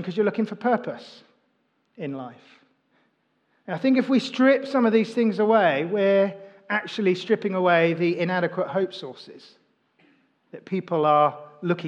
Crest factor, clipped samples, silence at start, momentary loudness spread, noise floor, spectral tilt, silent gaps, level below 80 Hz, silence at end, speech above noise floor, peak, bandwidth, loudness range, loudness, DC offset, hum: 18 dB; under 0.1%; 0 s; 15 LU; -70 dBFS; -7 dB/octave; none; -88 dBFS; 0 s; 47 dB; -6 dBFS; 9 kHz; 9 LU; -23 LUFS; under 0.1%; none